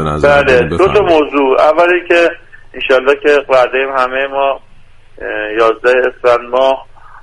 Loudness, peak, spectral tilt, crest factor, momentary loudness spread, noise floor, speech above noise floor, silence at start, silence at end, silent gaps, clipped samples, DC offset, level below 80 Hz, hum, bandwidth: -11 LUFS; 0 dBFS; -5.5 dB/octave; 12 dB; 10 LU; -36 dBFS; 26 dB; 0 s; 0.05 s; none; under 0.1%; under 0.1%; -36 dBFS; none; 11 kHz